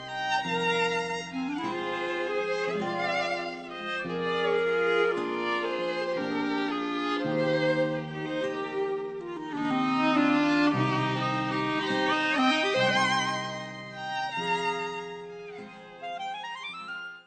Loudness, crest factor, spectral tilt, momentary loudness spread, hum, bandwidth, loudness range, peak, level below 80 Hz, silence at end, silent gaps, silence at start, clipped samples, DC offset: -28 LUFS; 16 dB; -5 dB/octave; 13 LU; none; 9 kHz; 5 LU; -12 dBFS; -66 dBFS; 0.05 s; none; 0 s; under 0.1%; under 0.1%